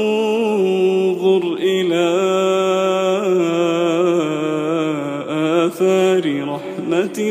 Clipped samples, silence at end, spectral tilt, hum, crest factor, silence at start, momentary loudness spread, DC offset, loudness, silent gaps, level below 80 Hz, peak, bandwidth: under 0.1%; 0 s; -5.5 dB/octave; none; 12 dB; 0 s; 5 LU; under 0.1%; -17 LUFS; none; -72 dBFS; -4 dBFS; 15 kHz